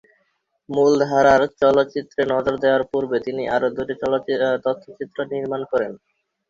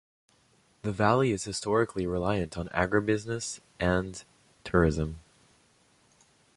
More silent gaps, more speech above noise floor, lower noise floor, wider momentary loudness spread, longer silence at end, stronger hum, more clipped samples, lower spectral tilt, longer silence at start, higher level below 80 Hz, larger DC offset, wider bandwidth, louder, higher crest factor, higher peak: neither; first, 49 dB vs 38 dB; first, -69 dBFS vs -65 dBFS; about the same, 11 LU vs 12 LU; second, 0.55 s vs 1.35 s; neither; neither; about the same, -5.5 dB/octave vs -5.5 dB/octave; second, 0.7 s vs 0.85 s; second, -56 dBFS vs -46 dBFS; neither; second, 7.6 kHz vs 11.5 kHz; first, -20 LUFS vs -29 LUFS; about the same, 18 dB vs 22 dB; first, -2 dBFS vs -8 dBFS